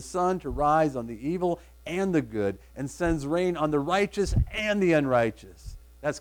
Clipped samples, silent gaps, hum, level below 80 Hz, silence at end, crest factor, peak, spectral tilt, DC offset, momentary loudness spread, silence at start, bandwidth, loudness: under 0.1%; none; none; -40 dBFS; 0 s; 16 dB; -12 dBFS; -6 dB/octave; under 0.1%; 13 LU; 0 s; 18.5 kHz; -27 LUFS